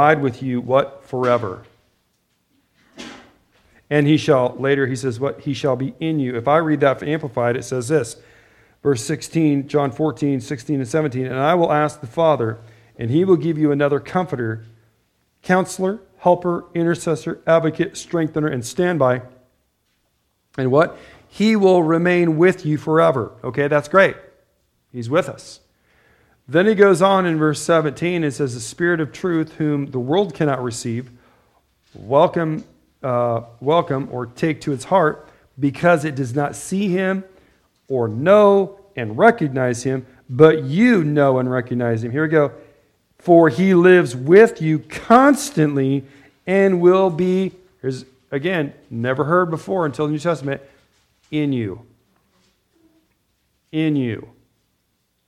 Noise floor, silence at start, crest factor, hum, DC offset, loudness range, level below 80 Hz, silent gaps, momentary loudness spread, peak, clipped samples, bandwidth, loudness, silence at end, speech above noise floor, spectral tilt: -68 dBFS; 0 s; 18 dB; none; under 0.1%; 7 LU; -58 dBFS; none; 13 LU; 0 dBFS; under 0.1%; 13.5 kHz; -18 LUFS; 1 s; 51 dB; -6.5 dB/octave